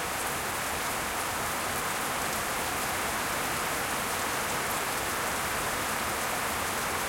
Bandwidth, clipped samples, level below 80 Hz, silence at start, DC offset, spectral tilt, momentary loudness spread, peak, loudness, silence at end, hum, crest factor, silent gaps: 16.5 kHz; under 0.1%; -52 dBFS; 0 s; under 0.1%; -2 dB/octave; 1 LU; -18 dBFS; -29 LUFS; 0 s; none; 14 dB; none